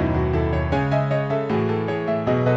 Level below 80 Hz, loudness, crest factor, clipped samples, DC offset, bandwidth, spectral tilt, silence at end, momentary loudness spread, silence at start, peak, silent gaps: -34 dBFS; -22 LUFS; 12 dB; under 0.1%; under 0.1%; 7.4 kHz; -9 dB/octave; 0 s; 2 LU; 0 s; -8 dBFS; none